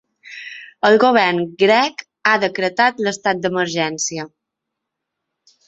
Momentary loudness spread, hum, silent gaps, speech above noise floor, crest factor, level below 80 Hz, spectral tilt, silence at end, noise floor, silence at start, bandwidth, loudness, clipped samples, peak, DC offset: 19 LU; none; none; 64 dB; 18 dB; -64 dBFS; -3.5 dB/octave; 1.4 s; -80 dBFS; 0.25 s; 8.2 kHz; -17 LUFS; under 0.1%; -2 dBFS; under 0.1%